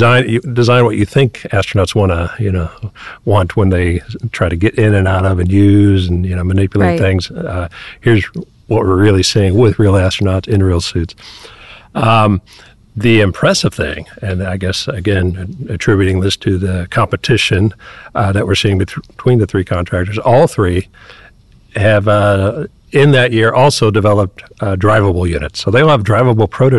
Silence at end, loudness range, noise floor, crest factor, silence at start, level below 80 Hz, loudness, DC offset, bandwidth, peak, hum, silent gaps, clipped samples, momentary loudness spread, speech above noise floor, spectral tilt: 0 s; 3 LU; -43 dBFS; 10 dB; 0 s; -26 dBFS; -13 LUFS; 0.8%; 12 kHz; -2 dBFS; none; none; under 0.1%; 11 LU; 31 dB; -6.5 dB/octave